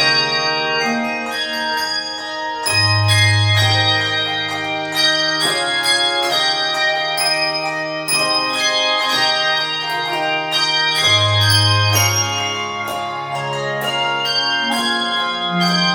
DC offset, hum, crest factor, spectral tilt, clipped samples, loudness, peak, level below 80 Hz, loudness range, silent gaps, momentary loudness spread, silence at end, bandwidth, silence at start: under 0.1%; none; 16 dB; -3 dB/octave; under 0.1%; -16 LUFS; -2 dBFS; -56 dBFS; 3 LU; none; 8 LU; 0 s; 19 kHz; 0 s